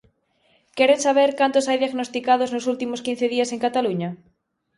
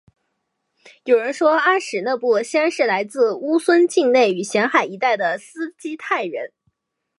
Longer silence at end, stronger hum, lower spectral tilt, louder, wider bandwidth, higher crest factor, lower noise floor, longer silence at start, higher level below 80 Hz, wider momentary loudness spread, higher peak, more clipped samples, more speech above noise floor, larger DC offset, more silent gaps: about the same, 0.6 s vs 0.7 s; neither; about the same, -4 dB/octave vs -4 dB/octave; about the same, -21 LUFS vs -19 LUFS; about the same, 11.5 kHz vs 11.5 kHz; about the same, 18 dB vs 18 dB; second, -67 dBFS vs -74 dBFS; second, 0.75 s vs 1.05 s; first, -68 dBFS vs -78 dBFS; second, 9 LU vs 13 LU; about the same, -4 dBFS vs -2 dBFS; neither; second, 46 dB vs 55 dB; neither; neither